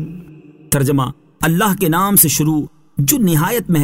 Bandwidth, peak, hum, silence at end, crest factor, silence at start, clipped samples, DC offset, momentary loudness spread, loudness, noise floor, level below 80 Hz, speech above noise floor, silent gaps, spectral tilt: 16.5 kHz; 0 dBFS; none; 0 s; 16 dB; 0 s; under 0.1%; 0.5%; 11 LU; -15 LUFS; -40 dBFS; -42 dBFS; 26 dB; none; -4.5 dB/octave